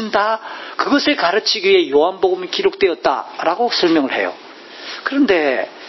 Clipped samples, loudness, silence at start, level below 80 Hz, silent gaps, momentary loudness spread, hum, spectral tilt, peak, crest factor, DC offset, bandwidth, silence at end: under 0.1%; -16 LUFS; 0 s; -58 dBFS; none; 11 LU; none; -3.5 dB/octave; 0 dBFS; 16 dB; under 0.1%; 6.2 kHz; 0 s